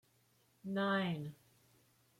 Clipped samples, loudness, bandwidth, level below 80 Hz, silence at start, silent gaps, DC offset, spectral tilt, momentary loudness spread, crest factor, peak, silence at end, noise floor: under 0.1%; -38 LUFS; 15.5 kHz; -82 dBFS; 0.65 s; none; under 0.1%; -7 dB/octave; 16 LU; 18 dB; -24 dBFS; 0.85 s; -73 dBFS